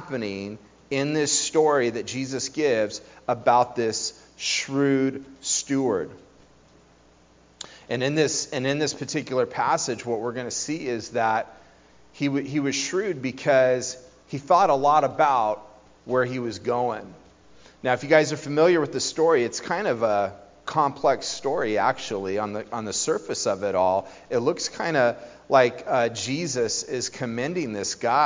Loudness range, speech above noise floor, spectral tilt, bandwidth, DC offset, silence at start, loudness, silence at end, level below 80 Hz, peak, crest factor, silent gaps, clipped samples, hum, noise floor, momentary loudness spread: 5 LU; 32 dB; -3.5 dB/octave; 7.8 kHz; under 0.1%; 0 s; -24 LUFS; 0 s; -62 dBFS; -2 dBFS; 22 dB; none; under 0.1%; none; -56 dBFS; 10 LU